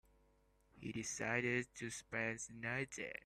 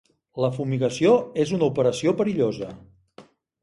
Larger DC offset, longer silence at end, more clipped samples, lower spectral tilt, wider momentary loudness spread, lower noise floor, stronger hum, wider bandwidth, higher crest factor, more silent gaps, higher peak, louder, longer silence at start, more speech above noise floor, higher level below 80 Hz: neither; second, 0.05 s vs 0.4 s; neither; second, -4 dB/octave vs -6.5 dB/octave; about the same, 10 LU vs 10 LU; first, -74 dBFS vs -51 dBFS; neither; first, 14.5 kHz vs 11.5 kHz; first, 22 dB vs 16 dB; neither; second, -24 dBFS vs -6 dBFS; second, -42 LUFS vs -23 LUFS; first, 0.75 s vs 0.35 s; about the same, 31 dB vs 29 dB; second, -72 dBFS vs -60 dBFS